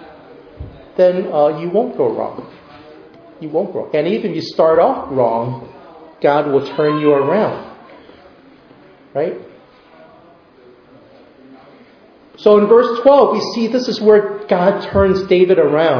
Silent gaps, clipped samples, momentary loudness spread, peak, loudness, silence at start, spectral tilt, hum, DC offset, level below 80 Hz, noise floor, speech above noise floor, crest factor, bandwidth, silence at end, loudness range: none; under 0.1%; 15 LU; 0 dBFS; -15 LUFS; 0 s; -7 dB/octave; none; under 0.1%; -46 dBFS; -46 dBFS; 32 dB; 16 dB; 5.4 kHz; 0 s; 17 LU